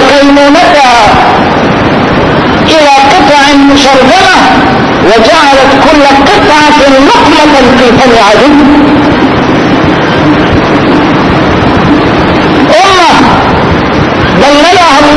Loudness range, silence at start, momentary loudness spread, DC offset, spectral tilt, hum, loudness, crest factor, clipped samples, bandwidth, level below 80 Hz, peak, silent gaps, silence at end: 3 LU; 0 s; 4 LU; under 0.1%; -5 dB/octave; none; -3 LUFS; 2 dB; 20%; 11 kHz; -24 dBFS; 0 dBFS; none; 0 s